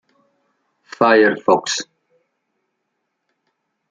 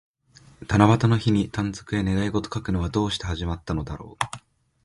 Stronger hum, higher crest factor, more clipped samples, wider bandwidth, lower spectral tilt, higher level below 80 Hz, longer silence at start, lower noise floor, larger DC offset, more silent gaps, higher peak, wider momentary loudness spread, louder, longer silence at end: neither; about the same, 20 dB vs 22 dB; neither; second, 9.4 kHz vs 11.5 kHz; second, -3.5 dB/octave vs -6.5 dB/octave; second, -68 dBFS vs -40 dBFS; first, 1 s vs 0.6 s; first, -74 dBFS vs -54 dBFS; neither; neither; about the same, -2 dBFS vs -2 dBFS; about the same, 12 LU vs 12 LU; first, -16 LUFS vs -24 LUFS; first, 2.05 s vs 0.45 s